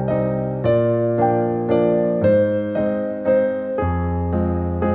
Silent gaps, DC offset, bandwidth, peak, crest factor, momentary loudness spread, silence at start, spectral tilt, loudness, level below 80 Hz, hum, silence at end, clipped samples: none; under 0.1%; 4.5 kHz; -6 dBFS; 14 dB; 5 LU; 0 s; -12.5 dB/octave; -19 LUFS; -38 dBFS; none; 0 s; under 0.1%